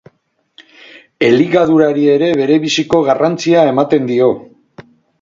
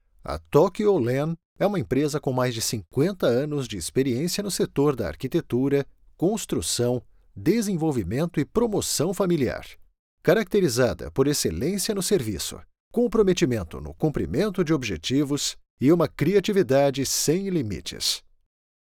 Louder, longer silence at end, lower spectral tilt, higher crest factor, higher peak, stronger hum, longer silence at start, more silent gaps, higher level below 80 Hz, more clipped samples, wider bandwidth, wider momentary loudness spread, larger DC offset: first, -12 LUFS vs -24 LUFS; second, 0.4 s vs 0.75 s; about the same, -5.5 dB/octave vs -5 dB/octave; about the same, 14 dB vs 18 dB; first, 0 dBFS vs -6 dBFS; neither; first, 1.2 s vs 0.25 s; second, none vs 1.45-1.56 s, 9.99-10.18 s, 12.80-12.91 s, 15.70-15.77 s; second, -56 dBFS vs -48 dBFS; neither; second, 7.6 kHz vs 19.5 kHz; second, 3 LU vs 8 LU; neither